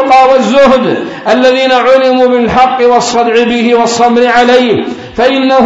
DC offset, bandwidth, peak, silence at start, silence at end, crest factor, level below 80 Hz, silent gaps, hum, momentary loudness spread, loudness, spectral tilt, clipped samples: under 0.1%; 8 kHz; 0 dBFS; 0 s; 0 s; 6 dB; -40 dBFS; none; none; 6 LU; -7 LUFS; -4 dB/octave; 2%